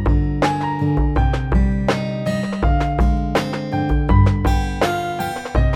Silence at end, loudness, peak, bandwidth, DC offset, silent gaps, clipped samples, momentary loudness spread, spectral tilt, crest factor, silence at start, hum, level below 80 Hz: 0 s; -19 LUFS; -4 dBFS; 16 kHz; under 0.1%; none; under 0.1%; 6 LU; -7 dB/octave; 14 dB; 0 s; none; -20 dBFS